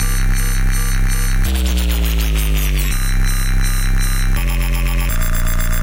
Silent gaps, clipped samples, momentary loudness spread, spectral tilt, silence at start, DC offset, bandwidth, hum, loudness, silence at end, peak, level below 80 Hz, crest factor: none; under 0.1%; 2 LU; -4 dB/octave; 0 s; under 0.1%; 17 kHz; none; -19 LUFS; 0 s; -6 dBFS; -14 dBFS; 8 dB